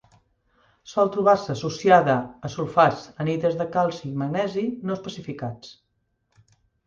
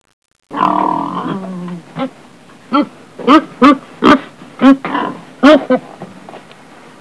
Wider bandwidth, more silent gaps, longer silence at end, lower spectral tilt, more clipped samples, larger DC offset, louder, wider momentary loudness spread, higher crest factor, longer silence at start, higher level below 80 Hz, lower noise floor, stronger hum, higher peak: second, 7.6 kHz vs 11 kHz; neither; first, 1.15 s vs 0.6 s; about the same, -6.5 dB/octave vs -6 dB/octave; second, under 0.1% vs 0.6%; second, under 0.1% vs 0.3%; second, -23 LUFS vs -13 LUFS; about the same, 15 LU vs 17 LU; first, 20 dB vs 14 dB; first, 0.85 s vs 0.5 s; second, -60 dBFS vs -50 dBFS; first, -72 dBFS vs -40 dBFS; neither; second, -4 dBFS vs 0 dBFS